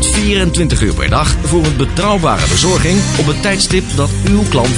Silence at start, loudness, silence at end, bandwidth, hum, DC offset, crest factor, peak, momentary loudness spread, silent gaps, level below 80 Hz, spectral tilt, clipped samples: 0 s; -12 LUFS; 0 s; 11 kHz; none; under 0.1%; 12 dB; 0 dBFS; 3 LU; none; -20 dBFS; -4.5 dB/octave; under 0.1%